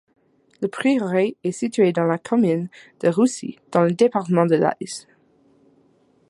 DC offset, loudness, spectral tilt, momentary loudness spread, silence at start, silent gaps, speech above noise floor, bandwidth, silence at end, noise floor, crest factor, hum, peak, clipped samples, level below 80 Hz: under 0.1%; -21 LUFS; -6.5 dB/octave; 12 LU; 0.6 s; none; 39 dB; 11.5 kHz; 1.3 s; -59 dBFS; 18 dB; none; -2 dBFS; under 0.1%; -70 dBFS